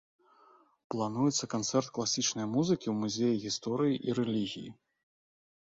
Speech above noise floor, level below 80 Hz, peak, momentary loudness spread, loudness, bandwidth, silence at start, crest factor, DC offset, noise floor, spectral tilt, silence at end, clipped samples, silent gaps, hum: 32 dB; -72 dBFS; -16 dBFS; 6 LU; -32 LUFS; 7.8 kHz; 0.9 s; 18 dB; under 0.1%; -63 dBFS; -4.5 dB/octave; 0.95 s; under 0.1%; none; none